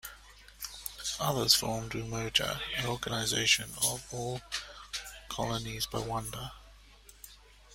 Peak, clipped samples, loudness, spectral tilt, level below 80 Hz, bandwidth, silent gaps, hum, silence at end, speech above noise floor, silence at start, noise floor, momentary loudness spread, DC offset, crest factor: -8 dBFS; under 0.1%; -31 LUFS; -2.5 dB/octave; -54 dBFS; 16.5 kHz; none; none; 0 s; 24 dB; 0.05 s; -56 dBFS; 17 LU; under 0.1%; 26 dB